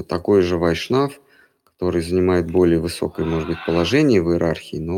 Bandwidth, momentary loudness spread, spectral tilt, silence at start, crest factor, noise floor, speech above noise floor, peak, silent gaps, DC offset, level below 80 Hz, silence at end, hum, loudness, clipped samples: 15.5 kHz; 8 LU; -6.5 dB/octave; 0 s; 14 dB; -56 dBFS; 37 dB; -4 dBFS; none; under 0.1%; -42 dBFS; 0 s; none; -19 LUFS; under 0.1%